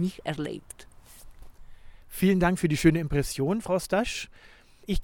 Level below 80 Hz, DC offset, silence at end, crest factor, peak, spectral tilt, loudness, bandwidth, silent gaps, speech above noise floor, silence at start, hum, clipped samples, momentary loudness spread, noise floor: -42 dBFS; under 0.1%; 0 s; 20 dB; -8 dBFS; -6 dB/octave; -27 LUFS; 18.5 kHz; none; 21 dB; 0 s; none; under 0.1%; 19 LU; -48 dBFS